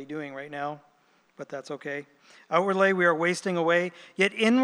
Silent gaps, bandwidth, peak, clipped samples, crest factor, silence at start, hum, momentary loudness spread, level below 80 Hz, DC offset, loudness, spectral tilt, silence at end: none; 12 kHz; -8 dBFS; under 0.1%; 20 dB; 0 s; none; 16 LU; -88 dBFS; under 0.1%; -26 LUFS; -5 dB/octave; 0 s